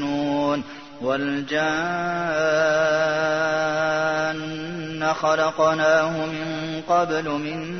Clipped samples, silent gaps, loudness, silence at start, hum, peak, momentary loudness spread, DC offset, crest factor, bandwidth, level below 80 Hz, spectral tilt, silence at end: under 0.1%; none; -22 LUFS; 0 s; none; -6 dBFS; 9 LU; 0.2%; 16 dB; 6.6 kHz; -60 dBFS; -5 dB/octave; 0 s